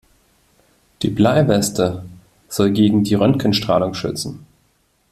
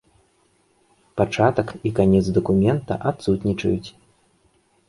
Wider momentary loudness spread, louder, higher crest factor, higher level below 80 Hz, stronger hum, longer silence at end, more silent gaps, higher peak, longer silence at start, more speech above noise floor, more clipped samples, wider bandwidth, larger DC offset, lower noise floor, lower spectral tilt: first, 11 LU vs 7 LU; first, -17 LUFS vs -21 LUFS; about the same, 18 dB vs 20 dB; about the same, -48 dBFS vs -44 dBFS; neither; second, 0.75 s vs 1 s; neither; about the same, -2 dBFS vs -2 dBFS; second, 1 s vs 1.15 s; about the same, 45 dB vs 42 dB; neither; first, 14 kHz vs 11.5 kHz; neither; about the same, -61 dBFS vs -62 dBFS; second, -6 dB/octave vs -7.5 dB/octave